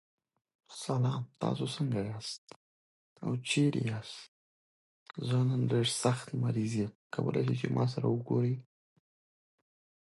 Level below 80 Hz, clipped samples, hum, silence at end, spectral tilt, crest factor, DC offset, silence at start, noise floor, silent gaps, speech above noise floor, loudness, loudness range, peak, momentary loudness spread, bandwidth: -70 dBFS; under 0.1%; none; 1.5 s; -6 dB/octave; 20 dB; under 0.1%; 0.7 s; under -90 dBFS; 2.38-2.47 s, 2.56-3.16 s, 4.28-5.06 s, 6.95-7.10 s; over 58 dB; -33 LUFS; 5 LU; -14 dBFS; 12 LU; 11.5 kHz